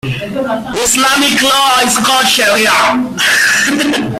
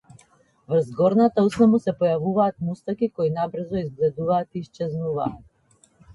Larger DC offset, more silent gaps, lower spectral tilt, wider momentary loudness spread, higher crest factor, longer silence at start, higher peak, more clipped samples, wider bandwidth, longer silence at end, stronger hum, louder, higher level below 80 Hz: neither; neither; second, -2 dB/octave vs -8.5 dB/octave; about the same, 9 LU vs 11 LU; about the same, 12 dB vs 16 dB; second, 0.05 s vs 0.7 s; first, 0 dBFS vs -6 dBFS; neither; first, 16.5 kHz vs 11.5 kHz; about the same, 0 s vs 0 s; neither; first, -10 LUFS vs -23 LUFS; first, -44 dBFS vs -56 dBFS